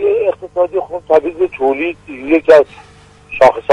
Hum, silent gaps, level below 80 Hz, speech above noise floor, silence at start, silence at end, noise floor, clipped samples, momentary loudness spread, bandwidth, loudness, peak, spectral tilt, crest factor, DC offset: 50 Hz at -50 dBFS; none; -48 dBFS; 23 dB; 0 s; 0 s; -35 dBFS; 0.2%; 12 LU; 10.5 kHz; -13 LUFS; 0 dBFS; -6 dB/octave; 14 dB; under 0.1%